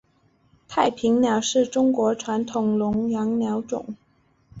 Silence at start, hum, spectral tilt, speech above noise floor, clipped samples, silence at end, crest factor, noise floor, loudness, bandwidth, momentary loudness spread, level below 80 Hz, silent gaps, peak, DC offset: 0.7 s; none; -5 dB/octave; 41 dB; under 0.1%; 0 s; 18 dB; -62 dBFS; -23 LUFS; 8 kHz; 10 LU; -58 dBFS; none; -6 dBFS; under 0.1%